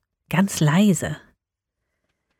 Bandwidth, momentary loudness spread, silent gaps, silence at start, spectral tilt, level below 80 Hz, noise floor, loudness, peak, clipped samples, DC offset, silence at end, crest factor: 17 kHz; 13 LU; none; 0.3 s; -5.5 dB/octave; -56 dBFS; -82 dBFS; -20 LUFS; -6 dBFS; under 0.1%; under 0.1%; 1.2 s; 16 dB